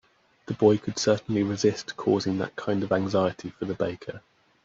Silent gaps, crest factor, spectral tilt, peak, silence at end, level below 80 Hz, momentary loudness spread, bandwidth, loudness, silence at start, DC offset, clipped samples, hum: none; 18 dB; -5.5 dB/octave; -8 dBFS; 0.45 s; -64 dBFS; 13 LU; 7.8 kHz; -26 LUFS; 0.5 s; under 0.1%; under 0.1%; none